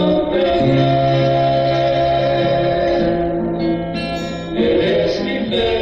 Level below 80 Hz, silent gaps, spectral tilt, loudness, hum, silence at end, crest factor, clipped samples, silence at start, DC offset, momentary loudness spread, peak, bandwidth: -36 dBFS; none; -7.5 dB/octave; -17 LUFS; none; 0 s; 10 dB; under 0.1%; 0 s; under 0.1%; 6 LU; -6 dBFS; 8.2 kHz